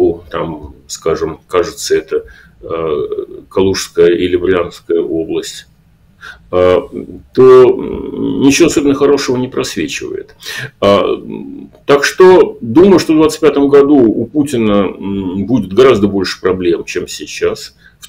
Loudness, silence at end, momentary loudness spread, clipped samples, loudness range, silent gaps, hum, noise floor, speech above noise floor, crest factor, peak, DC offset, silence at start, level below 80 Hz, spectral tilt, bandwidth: -11 LUFS; 0.4 s; 16 LU; under 0.1%; 6 LU; none; none; -48 dBFS; 36 dB; 12 dB; 0 dBFS; under 0.1%; 0 s; -40 dBFS; -5 dB/octave; 16 kHz